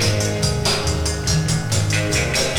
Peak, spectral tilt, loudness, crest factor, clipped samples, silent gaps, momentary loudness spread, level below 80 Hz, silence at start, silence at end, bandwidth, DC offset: -4 dBFS; -3.5 dB/octave; -19 LUFS; 14 dB; under 0.1%; none; 1 LU; -30 dBFS; 0 s; 0 s; 19.5 kHz; under 0.1%